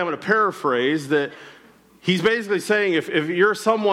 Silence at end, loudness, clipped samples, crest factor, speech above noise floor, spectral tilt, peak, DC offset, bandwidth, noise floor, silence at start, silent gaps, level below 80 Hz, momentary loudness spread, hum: 0 s; -21 LUFS; under 0.1%; 16 dB; 30 dB; -5 dB/octave; -6 dBFS; under 0.1%; 15 kHz; -51 dBFS; 0 s; none; -66 dBFS; 4 LU; none